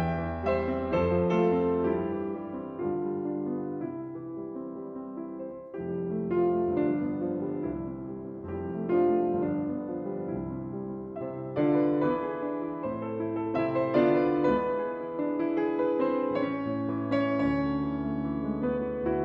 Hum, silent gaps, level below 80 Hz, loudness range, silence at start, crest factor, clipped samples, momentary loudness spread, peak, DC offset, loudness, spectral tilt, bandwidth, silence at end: none; none; -52 dBFS; 6 LU; 0 s; 16 dB; under 0.1%; 12 LU; -12 dBFS; under 0.1%; -30 LUFS; -10 dB/octave; 5.6 kHz; 0 s